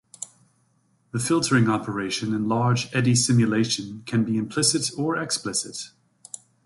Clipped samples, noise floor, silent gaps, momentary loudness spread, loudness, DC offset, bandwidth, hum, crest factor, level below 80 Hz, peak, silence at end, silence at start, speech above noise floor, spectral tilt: under 0.1%; -65 dBFS; none; 19 LU; -23 LUFS; under 0.1%; 11.5 kHz; none; 18 dB; -60 dBFS; -6 dBFS; 0.75 s; 0.2 s; 42 dB; -4.5 dB/octave